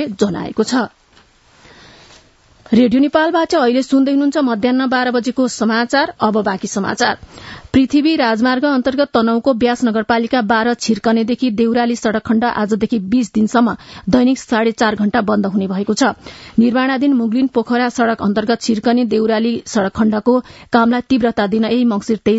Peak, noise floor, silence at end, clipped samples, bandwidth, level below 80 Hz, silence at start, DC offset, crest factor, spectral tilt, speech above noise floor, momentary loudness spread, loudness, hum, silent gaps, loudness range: 0 dBFS; -50 dBFS; 0 s; under 0.1%; 8 kHz; -48 dBFS; 0 s; under 0.1%; 16 dB; -5 dB/octave; 36 dB; 4 LU; -15 LUFS; none; none; 2 LU